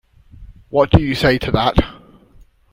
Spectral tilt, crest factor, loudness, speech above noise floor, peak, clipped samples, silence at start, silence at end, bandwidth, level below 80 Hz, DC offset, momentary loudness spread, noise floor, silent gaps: -7 dB/octave; 18 dB; -16 LUFS; 33 dB; 0 dBFS; under 0.1%; 0.4 s; 0.8 s; 16.5 kHz; -30 dBFS; under 0.1%; 7 LU; -48 dBFS; none